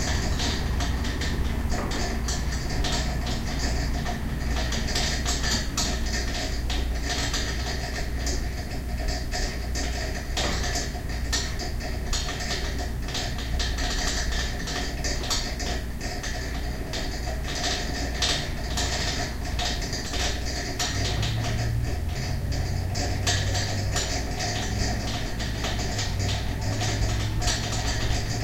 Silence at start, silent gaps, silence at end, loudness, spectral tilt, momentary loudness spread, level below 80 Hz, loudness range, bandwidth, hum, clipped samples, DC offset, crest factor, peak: 0 s; none; 0 s; -28 LUFS; -3.5 dB/octave; 5 LU; -30 dBFS; 2 LU; 16.5 kHz; none; under 0.1%; under 0.1%; 16 dB; -10 dBFS